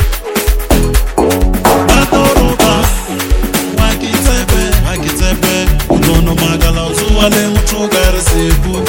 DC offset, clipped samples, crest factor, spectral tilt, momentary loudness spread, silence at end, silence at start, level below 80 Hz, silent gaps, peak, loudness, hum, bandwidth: under 0.1%; 0.5%; 10 dB; -4.5 dB/octave; 5 LU; 0 s; 0 s; -14 dBFS; none; 0 dBFS; -11 LUFS; none; 17.5 kHz